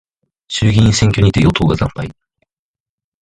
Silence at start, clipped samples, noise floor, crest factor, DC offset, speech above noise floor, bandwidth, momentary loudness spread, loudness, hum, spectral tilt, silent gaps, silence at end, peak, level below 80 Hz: 0.5 s; under 0.1%; under -90 dBFS; 16 dB; under 0.1%; over 78 dB; 11 kHz; 13 LU; -13 LUFS; none; -5.5 dB/octave; none; 1.1 s; 0 dBFS; -30 dBFS